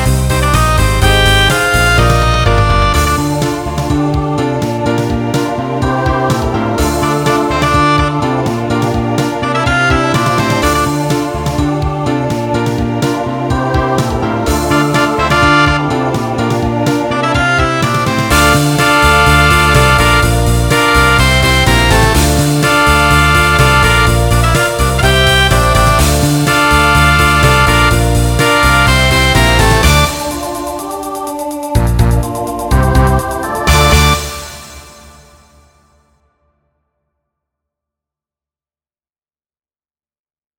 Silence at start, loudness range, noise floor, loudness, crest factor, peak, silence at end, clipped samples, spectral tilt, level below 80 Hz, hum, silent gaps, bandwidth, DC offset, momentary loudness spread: 0 s; 6 LU; under -90 dBFS; -11 LUFS; 12 dB; 0 dBFS; 5.7 s; under 0.1%; -4.5 dB/octave; -18 dBFS; none; none; 18.5 kHz; under 0.1%; 7 LU